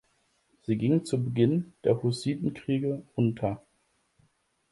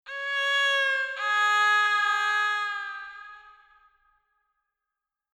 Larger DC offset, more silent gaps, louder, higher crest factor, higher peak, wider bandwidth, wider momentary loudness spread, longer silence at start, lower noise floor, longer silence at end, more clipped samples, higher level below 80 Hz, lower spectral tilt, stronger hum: neither; neither; second, -28 LUFS vs -24 LUFS; about the same, 18 dB vs 14 dB; first, -10 dBFS vs -14 dBFS; second, 11.5 kHz vs 14 kHz; second, 7 LU vs 15 LU; first, 0.7 s vs 0.05 s; second, -72 dBFS vs -87 dBFS; second, 1.15 s vs 1.85 s; neither; first, -62 dBFS vs -74 dBFS; first, -7.5 dB/octave vs 4 dB/octave; neither